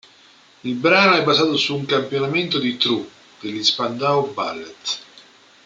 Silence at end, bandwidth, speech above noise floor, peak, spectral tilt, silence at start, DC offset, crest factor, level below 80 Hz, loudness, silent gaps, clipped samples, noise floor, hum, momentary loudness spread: 0.45 s; 9.2 kHz; 31 dB; -2 dBFS; -4 dB/octave; 0.65 s; under 0.1%; 20 dB; -68 dBFS; -19 LUFS; none; under 0.1%; -51 dBFS; none; 15 LU